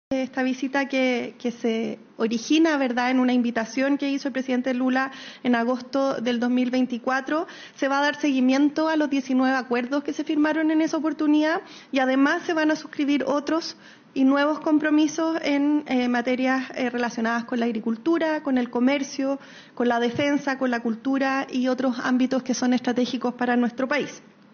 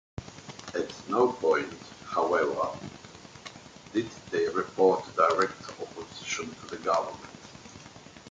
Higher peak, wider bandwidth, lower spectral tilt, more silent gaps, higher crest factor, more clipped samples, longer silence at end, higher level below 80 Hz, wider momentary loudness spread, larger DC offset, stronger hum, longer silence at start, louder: about the same, -8 dBFS vs -8 dBFS; second, 6.8 kHz vs 9.2 kHz; second, -2.5 dB/octave vs -4.5 dB/octave; neither; second, 14 dB vs 22 dB; neither; first, 0.35 s vs 0 s; second, -72 dBFS vs -62 dBFS; second, 6 LU vs 22 LU; neither; neither; about the same, 0.1 s vs 0.2 s; first, -24 LUFS vs -29 LUFS